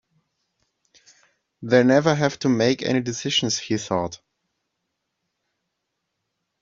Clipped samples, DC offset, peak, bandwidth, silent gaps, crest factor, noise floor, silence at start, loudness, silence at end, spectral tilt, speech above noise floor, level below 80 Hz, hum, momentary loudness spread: under 0.1%; under 0.1%; -2 dBFS; 7.6 kHz; none; 22 dB; -79 dBFS; 1.6 s; -21 LUFS; 2.45 s; -4 dB/octave; 58 dB; -62 dBFS; none; 9 LU